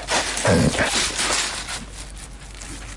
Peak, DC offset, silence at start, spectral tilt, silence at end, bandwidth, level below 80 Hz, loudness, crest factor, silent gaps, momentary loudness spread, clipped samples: -6 dBFS; under 0.1%; 0 s; -3 dB/octave; 0 s; 11.5 kHz; -38 dBFS; -20 LUFS; 16 dB; none; 19 LU; under 0.1%